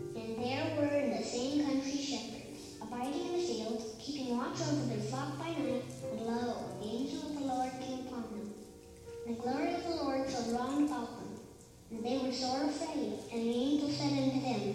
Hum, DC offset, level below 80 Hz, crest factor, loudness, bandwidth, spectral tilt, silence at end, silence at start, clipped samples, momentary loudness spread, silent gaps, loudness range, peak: none; under 0.1%; -64 dBFS; 16 dB; -36 LUFS; 15 kHz; -5 dB/octave; 0 s; 0 s; under 0.1%; 13 LU; none; 3 LU; -20 dBFS